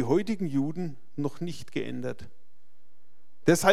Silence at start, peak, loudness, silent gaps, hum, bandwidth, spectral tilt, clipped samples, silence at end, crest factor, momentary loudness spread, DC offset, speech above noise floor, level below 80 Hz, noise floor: 0 s; -4 dBFS; -30 LUFS; none; none; 16 kHz; -5.5 dB/octave; under 0.1%; 0 s; 24 dB; 12 LU; 2%; 44 dB; -64 dBFS; -71 dBFS